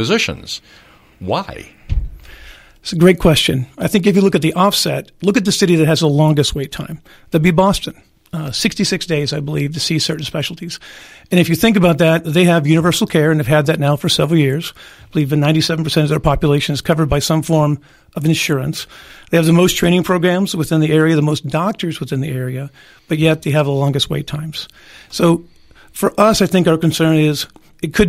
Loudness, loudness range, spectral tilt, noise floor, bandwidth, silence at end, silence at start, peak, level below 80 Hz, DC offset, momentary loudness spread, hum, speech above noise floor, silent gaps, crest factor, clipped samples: -15 LUFS; 4 LU; -5.5 dB/octave; -40 dBFS; 16 kHz; 0 s; 0 s; 0 dBFS; -36 dBFS; under 0.1%; 15 LU; none; 25 dB; none; 16 dB; under 0.1%